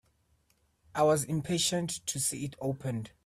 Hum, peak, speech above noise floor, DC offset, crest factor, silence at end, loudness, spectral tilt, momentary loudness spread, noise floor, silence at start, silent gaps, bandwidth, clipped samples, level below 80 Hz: none; -14 dBFS; 40 dB; under 0.1%; 18 dB; 0.2 s; -31 LUFS; -4 dB/octave; 9 LU; -72 dBFS; 0.95 s; none; 15.5 kHz; under 0.1%; -64 dBFS